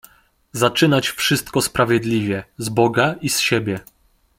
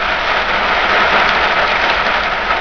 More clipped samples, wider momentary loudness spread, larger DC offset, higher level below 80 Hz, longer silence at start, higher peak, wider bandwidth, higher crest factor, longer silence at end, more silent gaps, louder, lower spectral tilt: neither; first, 9 LU vs 3 LU; second, under 0.1% vs 1%; second, -50 dBFS vs -34 dBFS; first, 0.55 s vs 0 s; about the same, -2 dBFS vs 0 dBFS; first, 16.5 kHz vs 5.4 kHz; about the same, 18 dB vs 14 dB; first, 0.6 s vs 0 s; neither; second, -18 LUFS vs -12 LUFS; about the same, -4 dB/octave vs -3 dB/octave